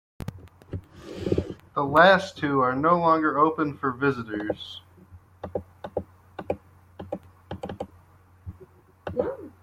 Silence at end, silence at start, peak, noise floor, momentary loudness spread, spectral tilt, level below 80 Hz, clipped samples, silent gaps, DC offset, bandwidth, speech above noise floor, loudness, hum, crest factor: 0.15 s; 0.2 s; -4 dBFS; -55 dBFS; 22 LU; -6.5 dB/octave; -56 dBFS; under 0.1%; none; under 0.1%; 15.5 kHz; 33 dB; -25 LUFS; none; 22 dB